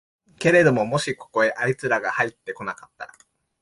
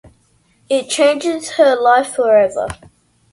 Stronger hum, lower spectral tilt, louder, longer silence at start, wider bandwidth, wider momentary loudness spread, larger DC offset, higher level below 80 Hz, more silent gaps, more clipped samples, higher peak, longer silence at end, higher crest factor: neither; first, -5.5 dB/octave vs -3 dB/octave; second, -22 LUFS vs -14 LUFS; second, 0.4 s vs 0.7 s; about the same, 11.5 kHz vs 11.5 kHz; first, 20 LU vs 10 LU; neither; second, -62 dBFS vs -50 dBFS; neither; neither; second, -4 dBFS vs 0 dBFS; about the same, 0.55 s vs 0.6 s; about the same, 18 dB vs 16 dB